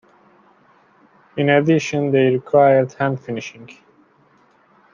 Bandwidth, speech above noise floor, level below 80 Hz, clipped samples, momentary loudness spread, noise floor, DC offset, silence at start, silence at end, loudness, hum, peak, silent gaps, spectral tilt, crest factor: 7.4 kHz; 39 dB; -64 dBFS; under 0.1%; 15 LU; -55 dBFS; under 0.1%; 1.35 s; 1.2 s; -17 LUFS; none; -2 dBFS; none; -6.5 dB/octave; 18 dB